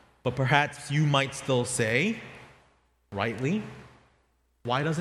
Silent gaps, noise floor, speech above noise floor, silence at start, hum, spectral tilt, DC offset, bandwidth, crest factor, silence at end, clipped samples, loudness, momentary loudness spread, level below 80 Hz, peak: none; -69 dBFS; 42 dB; 0.25 s; none; -5 dB/octave; under 0.1%; 13 kHz; 24 dB; 0 s; under 0.1%; -27 LUFS; 15 LU; -60 dBFS; -6 dBFS